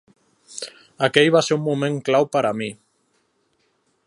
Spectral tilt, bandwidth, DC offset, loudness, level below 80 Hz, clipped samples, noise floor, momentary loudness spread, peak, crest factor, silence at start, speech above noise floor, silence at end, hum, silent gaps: -4.5 dB/octave; 11.5 kHz; under 0.1%; -20 LUFS; -70 dBFS; under 0.1%; -67 dBFS; 18 LU; 0 dBFS; 22 dB; 0.5 s; 48 dB; 1.3 s; none; none